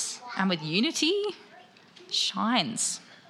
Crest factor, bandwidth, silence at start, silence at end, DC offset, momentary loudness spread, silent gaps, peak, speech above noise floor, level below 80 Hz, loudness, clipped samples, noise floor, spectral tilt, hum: 20 dB; 14 kHz; 0 s; 0.15 s; under 0.1%; 7 LU; none; -10 dBFS; 26 dB; -82 dBFS; -27 LUFS; under 0.1%; -53 dBFS; -2.5 dB/octave; none